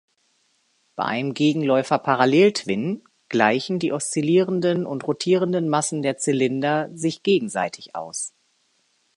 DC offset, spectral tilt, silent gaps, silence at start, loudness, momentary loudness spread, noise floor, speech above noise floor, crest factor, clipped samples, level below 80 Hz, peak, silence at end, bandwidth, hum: under 0.1%; -5 dB/octave; none; 0.95 s; -22 LUFS; 10 LU; -66 dBFS; 45 dB; 20 dB; under 0.1%; -70 dBFS; -2 dBFS; 0.9 s; 11.5 kHz; none